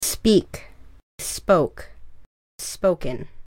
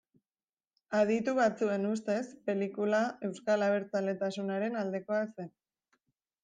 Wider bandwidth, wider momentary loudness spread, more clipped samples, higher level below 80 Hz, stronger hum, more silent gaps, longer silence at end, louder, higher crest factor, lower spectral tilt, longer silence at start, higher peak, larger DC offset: first, 17 kHz vs 9.4 kHz; first, 19 LU vs 7 LU; neither; first, -42 dBFS vs -80 dBFS; neither; first, 1.03-1.18 s, 2.26-2.58 s vs none; second, 0 s vs 0.95 s; first, -22 LUFS vs -32 LUFS; about the same, 20 dB vs 16 dB; second, -4.5 dB/octave vs -6 dB/octave; second, 0 s vs 0.9 s; first, -4 dBFS vs -16 dBFS; neither